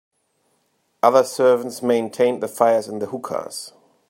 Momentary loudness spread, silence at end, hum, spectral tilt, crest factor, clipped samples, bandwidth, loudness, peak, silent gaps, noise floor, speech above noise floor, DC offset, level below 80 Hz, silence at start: 12 LU; 0.4 s; none; -4.5 dB/octave; 20 dB; under 0.1%; 16.5 kHz; -20 LUFS; 0 dBFS; none; -67 dBFS; 48 dB; under 0.1%; -74 dBFS; 1.05 s